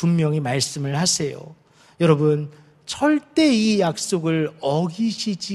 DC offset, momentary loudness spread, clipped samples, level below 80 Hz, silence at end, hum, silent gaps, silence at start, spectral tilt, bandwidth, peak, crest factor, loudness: under 0.1%; 9 LU; under 0.1%; -60 dBFS; 0 s; none; none; 0 s; -5 dB/octave; 13 kHz; -2 dBFS; 18 dB; -21 LUFS